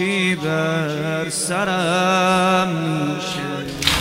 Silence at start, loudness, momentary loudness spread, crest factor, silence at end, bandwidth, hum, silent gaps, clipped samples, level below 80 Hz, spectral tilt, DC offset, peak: 0 s; -19 LUFS; 7 LU; 20 dB; 0 s; 16 kHz; none; none; under 0.1%; -44 dBFS; -4 dB/octave; under 0.1%; 0 dBFS